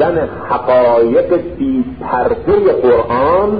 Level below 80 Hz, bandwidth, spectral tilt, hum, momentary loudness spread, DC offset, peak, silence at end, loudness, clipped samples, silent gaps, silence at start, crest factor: -36 dBFS; 5 kHz; -12.5 dB/octave; none; 7 LU; 0.8%; -2 dBFS; 0 s; -13 LUFS; under 0.1%; none; 0 s; 10 dB